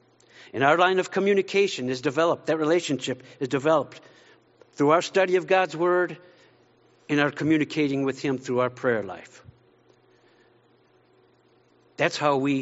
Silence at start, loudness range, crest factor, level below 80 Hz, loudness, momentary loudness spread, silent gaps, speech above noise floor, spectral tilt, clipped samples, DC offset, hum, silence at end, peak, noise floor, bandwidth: 0.4 s; 8 LU; 20 dB; -70 dBFS; -24 LUFS; 8 LU; none; 37 dB; -4 dB/octave; under 0.1%; under 0.1%; none; 0 s; -4 dBFS; -61 dBFS; 8 kHz